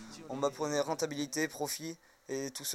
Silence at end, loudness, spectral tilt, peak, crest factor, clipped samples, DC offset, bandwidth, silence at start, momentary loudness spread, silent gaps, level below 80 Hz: 0 s; -36 LUFS; -3 dB/octave; -16 dBFS; 20 dB; under 0.1%; under 0.1%; 16.5 kHz; 0 s; 10 LU; none; -76 dBFS